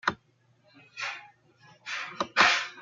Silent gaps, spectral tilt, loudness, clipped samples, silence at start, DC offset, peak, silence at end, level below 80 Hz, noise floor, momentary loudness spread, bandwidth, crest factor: none; -1 dB/octave; -27 LUFS; under 0.1%; 0.05 s; under 0.1%; -6 dBFS; 0 s; -74 dBFS; -66 dBFS; 24 LU; 9.6 kHz; 26 dB